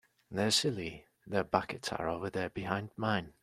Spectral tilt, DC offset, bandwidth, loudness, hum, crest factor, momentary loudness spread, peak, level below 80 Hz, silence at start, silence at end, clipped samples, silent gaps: -4 dB/octave; under 0.1%; 14.5 kHz; -34 LUFS; none; 24 dB; 12 LU; -10 dBFS; -64 dBFS; 0.3 s; 0.1 s; under 0.1%; none